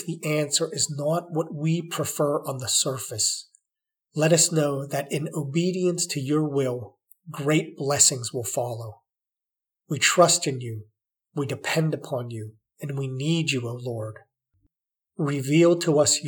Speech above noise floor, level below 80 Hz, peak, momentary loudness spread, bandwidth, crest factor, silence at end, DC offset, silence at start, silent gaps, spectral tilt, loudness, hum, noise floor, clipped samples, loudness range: 65 dB; -76 dBFS; -4 dBFS; 16 LU; 20 kHz; 22 dB; 0 s; under 0.1%; 0 s; none; -4 dB/octave; -24 LUFS; none; -90 dBFS; under 0.1%; 5 LU